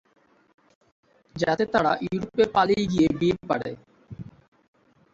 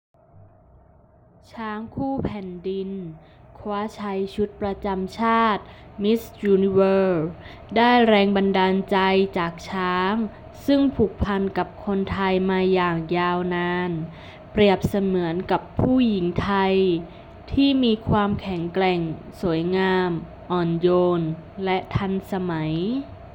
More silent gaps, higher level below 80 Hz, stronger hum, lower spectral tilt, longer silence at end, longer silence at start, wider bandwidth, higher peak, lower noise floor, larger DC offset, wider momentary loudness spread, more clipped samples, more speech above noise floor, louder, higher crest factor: neither; second, -54 dBFS vs -46 dBFS; neither; about the same, -6.5 dB/octave vs -7.5 dB/octave; first, 0.9 s vs 0.05 s; second, 1.35 s vs 1.55 s; second, 7.8 kHz vs 17 kHz; about the same, -8 dBFS vs -6 dBFS; second, -42 dBFS vs -53 dBFS; neither; first, 21 LU vs 12 LU; neither; second, 19 dB vs 32 dB; about the same, -24 LUFS vs -22 LUFS; about the same, 18 dB vs 16 dB